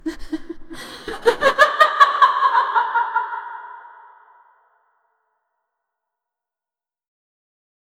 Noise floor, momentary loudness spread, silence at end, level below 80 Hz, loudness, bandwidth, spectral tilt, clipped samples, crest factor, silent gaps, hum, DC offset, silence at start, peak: under -90 dBFS; 22 LU; 4.2 s; -48 dBFS; -16 LUFS; 16 kHz; -2.5 dB/octave; under 0.1%; 22 dB; none; none; under 0.1%; 0.05 s; 0 dBFS